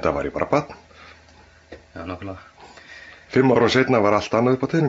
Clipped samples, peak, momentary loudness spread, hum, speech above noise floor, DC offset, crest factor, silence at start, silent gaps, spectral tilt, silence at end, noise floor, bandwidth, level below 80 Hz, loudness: under 0.1%; -4 dBFS; 24 LU; none; 31 dB; under 0.1%; 18 dB; 0 s; none; -6.5 dB/octave; 0 s; -50 dBFS; 8 kHz; -50 dBFS; -19 LUFS